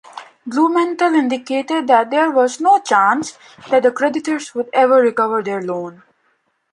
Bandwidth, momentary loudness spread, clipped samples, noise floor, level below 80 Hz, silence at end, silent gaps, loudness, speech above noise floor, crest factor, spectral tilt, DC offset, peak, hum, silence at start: 11 kHz; 11 LU; under 0.1%; -64 dBFS; -70 dBFS; 0.8 s; none; -16 LUFS; 48 dB; 16 dB; -4 dB/octave; under 0.1%; 0 dBFS; none; 0.15 s